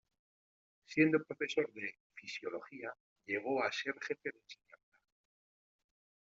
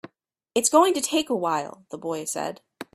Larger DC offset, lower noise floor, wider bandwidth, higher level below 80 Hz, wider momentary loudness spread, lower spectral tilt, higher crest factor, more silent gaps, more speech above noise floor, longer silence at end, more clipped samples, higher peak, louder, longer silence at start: neither; first, under -90 dBFS vs -65 dBFS; second, 7.6 kHz vs 15.5 kHz; second, -84 dBFS vs -70 dBFS; first, 20 LU vs 16 LU; about the same, -3.5 dB/octave vs -2.5 dB/octave; about the same, 24 dB vs 22 dB; first, 2.00-2.10 s, 3.00-3.16 s vs none; first, over 52 dB vs 41 dB; first, 1.8 s vs 0.1 s; neither; second, -16 dBFS vs -4 dBFS; second, -38 LUFS vs -24 LUFS; first, 0.9 s vs 0.55 s